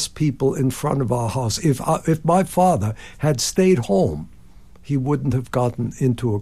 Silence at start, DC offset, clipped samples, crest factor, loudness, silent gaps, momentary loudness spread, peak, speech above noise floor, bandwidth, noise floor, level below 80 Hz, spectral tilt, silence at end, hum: 0 s; 0.6%; under 0.1%; 16 dB; -20 LUFS; none; 6 LU; -4 dBFS; 27 dB; 15 kHz; -47 dBFS; -44 dBFS; -6 dB/octave; 0 s; none